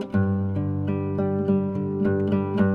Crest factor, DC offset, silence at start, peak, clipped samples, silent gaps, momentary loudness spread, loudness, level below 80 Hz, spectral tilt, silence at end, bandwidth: 14 dB; under 0.1%; 0 s; -10 dBFS; under 0.1%; none; 4 LU; -24 LUFS; -56 dBFS; -11 dB/octave; 0 s; 4.5 kHz